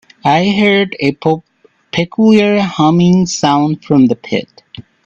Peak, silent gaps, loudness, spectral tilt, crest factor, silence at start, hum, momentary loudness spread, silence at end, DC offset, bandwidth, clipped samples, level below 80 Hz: 0 dBFS; none; -12 LUFS; -6 dB/octave; 12 dB; 0.25 s; none; 10 LU; 0.25 s; under 0.1%; 7.8 kHz; under 0.1%; -50 dBFS